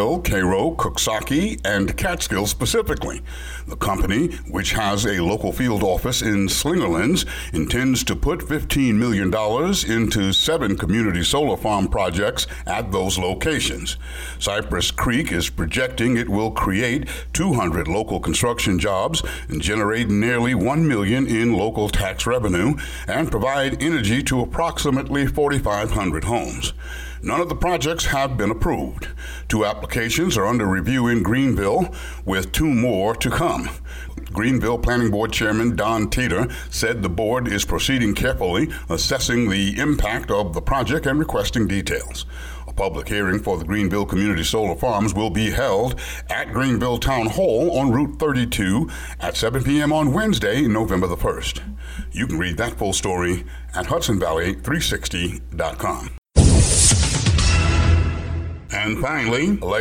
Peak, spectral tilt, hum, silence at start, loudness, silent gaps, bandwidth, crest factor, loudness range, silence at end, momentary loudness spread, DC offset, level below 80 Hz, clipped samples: 0 dBFS; -4.5 dB/octave; none; 0 s; -20 LUFS; 56.18-56.22 s; 19 kHz; 20 dB; 4 LU; 0 s; 7 LU; under 0.1%; -30 dBFS; under 0.1%